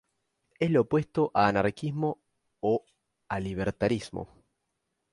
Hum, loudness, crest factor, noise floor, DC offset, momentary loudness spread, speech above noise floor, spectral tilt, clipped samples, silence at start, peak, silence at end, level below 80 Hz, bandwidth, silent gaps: none; -28 LUFS; 22 dB; -81 dBFS; under 0.1%; 13 LU; 53 dB; -7.5 dB/octave; under 0.1%; 0.6 s; -8 dBFS; 0.9 s; -56 dBFS; 11.5 kHz; none